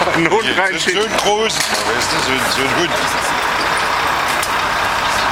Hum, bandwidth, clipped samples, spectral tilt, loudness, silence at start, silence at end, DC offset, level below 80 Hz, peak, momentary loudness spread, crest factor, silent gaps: none; 16.5 kHz; under 0.1%; -2 dB/octave; -15 LUFS; 0 s; 0 s; under 0.1%; -42 dBFS; 0 dBFS; 2 LU; 16 dB; none